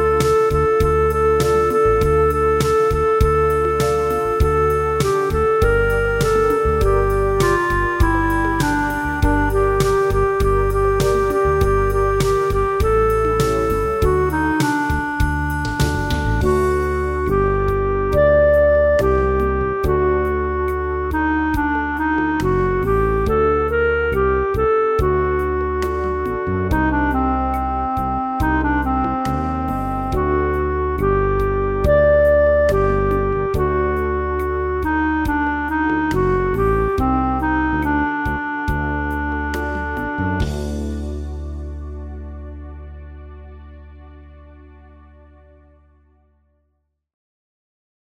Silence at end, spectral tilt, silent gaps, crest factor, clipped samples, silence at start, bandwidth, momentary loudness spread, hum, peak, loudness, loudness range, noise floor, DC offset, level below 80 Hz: 3.4 s; -7 dB/octave; none; 14 dB; under 0.1%; 0 s; 16 kHz; 7 LU; none; -2 dBFS; -18 LUFS; 6 LU; -69 dBFS; under 0.1%; -26 dBFS